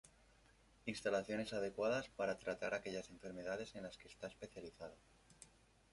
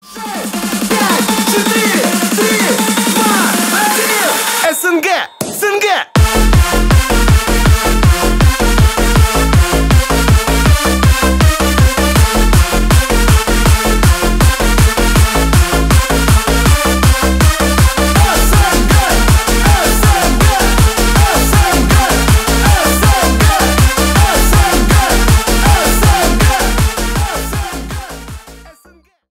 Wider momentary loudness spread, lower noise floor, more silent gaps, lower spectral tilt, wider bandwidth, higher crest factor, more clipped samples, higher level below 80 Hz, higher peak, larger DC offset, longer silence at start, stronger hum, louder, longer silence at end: first, 16 LU vs 3 LU; first, -70 dBFS vs -47 dBFS; neither; about the same, -4.5 dB/octave vs -4 dB/octave; second, 11.5 kHz vs 16.5 kHz; first, 20 dB vs 10 dB; neither; second, -72 dBFS vs -14 dBFS; second, -26 dBFS vs 0 dBFS; neither; about the same, 0.05 s vs 0.1 s; neither; second, -45 LUFS vs -11 LUFS; second, 0.45 s vs 0.7 s